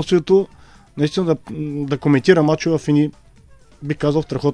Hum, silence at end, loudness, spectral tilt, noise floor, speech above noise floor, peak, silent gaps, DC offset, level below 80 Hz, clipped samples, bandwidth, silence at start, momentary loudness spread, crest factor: none; 0 s; -18 LUFS; -7 dB/octave; -47 dBFS; 30 dB; 0 dBFS; none; under 0.1%; -48 dBFS; under 0.1%; 10.5 kHz; 0 s; 13 LU; 18 dB